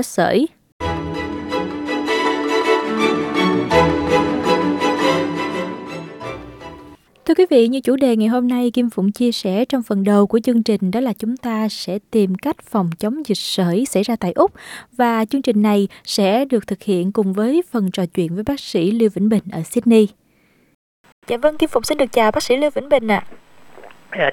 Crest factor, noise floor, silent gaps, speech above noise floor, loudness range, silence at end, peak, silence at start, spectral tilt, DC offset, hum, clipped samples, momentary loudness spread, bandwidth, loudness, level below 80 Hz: 16 dB; -57 dBFS; 0.72-0.79 s, 20.75-21.04 s, 21.12-21.22 s; 40 dB; 3 LU; 0 s; -2 dBFS; 0 s; -5.5 dB/octave; under 0.1%; none; under 0.1%; 9 LU; 17 kHz; -18 LUFS; -48 dBFS